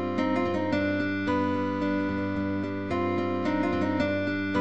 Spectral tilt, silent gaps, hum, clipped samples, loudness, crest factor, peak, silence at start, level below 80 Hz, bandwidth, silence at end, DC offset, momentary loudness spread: -7.5 dB/octave; none; none; under 0.1%; -28 LUFS; 14 dB; -14 dBFS; 0 s; -54 dBFS; 8 kHz; 0 s; 0.5%; 3 LU